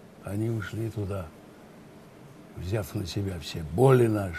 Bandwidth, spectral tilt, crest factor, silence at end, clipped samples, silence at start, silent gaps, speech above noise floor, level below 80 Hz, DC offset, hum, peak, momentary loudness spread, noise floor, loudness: 14 kHz; -7 dB/octave; 22 dB; 0 s; under 0.1%; 0 s; none; 23 dB; -52 dBFS; under 0.1%; none; -8 dBFS; 16 LU; -49 dBFS; -28 LUFS